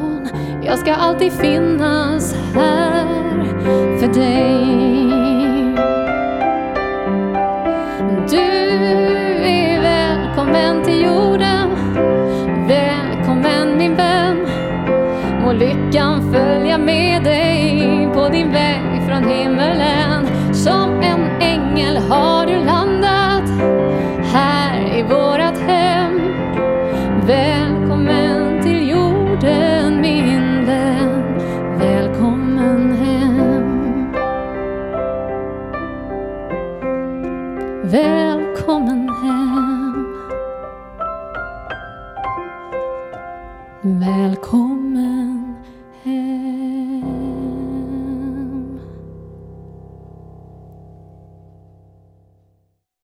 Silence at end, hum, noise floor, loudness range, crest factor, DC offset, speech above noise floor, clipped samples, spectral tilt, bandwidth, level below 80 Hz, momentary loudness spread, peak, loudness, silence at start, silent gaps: 2.3 s; none; -64 dBFS; 9 LU; 14 dB; under 0.1%; 50 dB; under 0.1%; -6.5 dB/octave; 14.5 kHz; -38 dBFS; 11 LU; -2 dBFS; -16 LUFS; 0 s; none